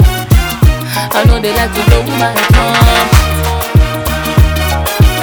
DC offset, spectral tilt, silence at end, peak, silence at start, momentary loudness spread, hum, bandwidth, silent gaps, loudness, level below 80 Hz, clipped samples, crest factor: under 0.1%; -5 dB/octave; 0 s; 0 dBFS; 0 s; 5 LU; none; over 20 kHz; none; -10 LUFS; -14 dBFS; 0.7%; 10 dB